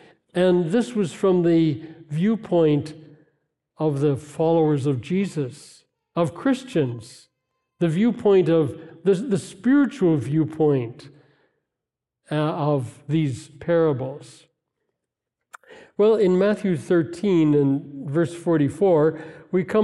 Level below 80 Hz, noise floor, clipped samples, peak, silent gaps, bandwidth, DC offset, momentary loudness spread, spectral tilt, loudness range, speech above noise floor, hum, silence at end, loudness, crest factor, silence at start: -66 dBFS; -86 dBFS; under 0.1%; -6 dBFS; none; 12 kHz; under 0.1%; 10 LU; -8 dB/octave; 5 LU; 65 dB; none; 0 s; -22 LUFS; 16 dB; 0.35 s